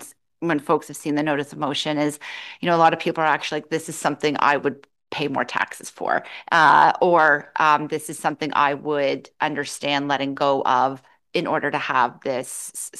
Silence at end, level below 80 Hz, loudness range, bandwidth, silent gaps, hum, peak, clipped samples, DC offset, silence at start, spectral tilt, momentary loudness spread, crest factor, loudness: 0 s; -72 dBFS; 4 LU; 12.5 kHz; none; none; -2 dBFS; under 0.1%; under 0.1%; 0 s; -4 dB/octave; 11 LU; 20 dB; -21 LUFS